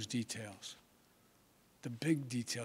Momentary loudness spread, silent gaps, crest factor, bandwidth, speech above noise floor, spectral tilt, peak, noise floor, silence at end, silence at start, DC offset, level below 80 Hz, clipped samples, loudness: 14 LU; none; 20 dB; 16 kHz; 30 dB; -4.5 dB/octave; -22 dBFS; -69 dBFS; 0 s; 0 s; under 0.1%; -80 dBFS; under 0.1%; -40 LUFS